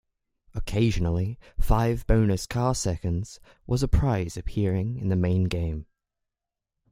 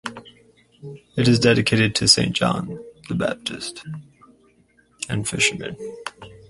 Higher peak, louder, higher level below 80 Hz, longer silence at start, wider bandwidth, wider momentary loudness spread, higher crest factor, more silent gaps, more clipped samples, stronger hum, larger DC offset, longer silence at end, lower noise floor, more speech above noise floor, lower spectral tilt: second, -8 dBFS vs 0 dBFS; second, -26 LUFS vs -20 LUFS; first, -34 dBFS vs -50 dBFS; first, 0.55 s vs 0.05 s; first, 16 kHz vs 11.5 kHz; second, 10 LU vs 20 LU; second, 16 dB vs 22 dB; neither; neither; neither; neither; first, 1.1 s vs 0.15 s; first, -87 dBFS vs -59 dBFS; first, 63 dB vs 37 dB; first, -6.5 dB/octave vs -4 dB/octave